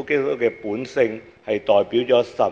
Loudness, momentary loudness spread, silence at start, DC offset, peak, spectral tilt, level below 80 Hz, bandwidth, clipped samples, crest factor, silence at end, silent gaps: -21 LUFS; 8 LU; 0 s; under 0.1%; -4 dBFS; -6 dB/octave; -60 dBFS; 7.6 kHz; under 0.1%; 18 dB; 0 s; none